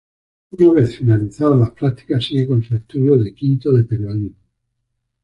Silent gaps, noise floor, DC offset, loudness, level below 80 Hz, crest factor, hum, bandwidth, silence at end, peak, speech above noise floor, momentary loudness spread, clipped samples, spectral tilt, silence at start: none; -73 dBFS; under 0.1%; -17 LUFS; -46 dBFS; 14 dB; none; 8 kHz; 0.95 s; -2 dBFS; 57 dB; 9 LU; under 0.1%; -9.5 dB/octave; 0.55 s